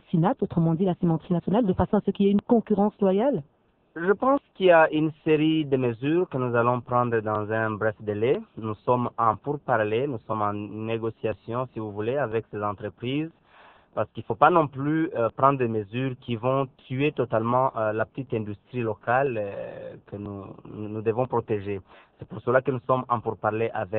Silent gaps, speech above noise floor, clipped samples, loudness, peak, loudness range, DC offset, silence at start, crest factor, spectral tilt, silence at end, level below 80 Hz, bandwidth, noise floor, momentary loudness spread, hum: none; 30 dB; under 0.1%; -25 LUFS; -2 dBFS; 7 LU; under 0.1%; 0.15 s; 22 dB; -11 dB/octave; 0 s; -56 dBFS; 4.2 kHz; -54 dBFS; 11 LU; none